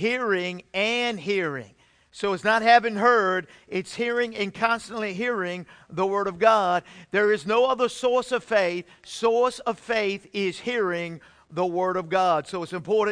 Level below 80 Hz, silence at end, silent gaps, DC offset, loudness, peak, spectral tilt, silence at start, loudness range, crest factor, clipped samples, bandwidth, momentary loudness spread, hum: -64 dBFS; 0 s; none; under 0.1%; -24 LUFS; -6 dBFS; -4.5 dB/octave; 0 s; 3 LU; 18 dB; under 0.1%; 10.5 kHz; 12 LU; none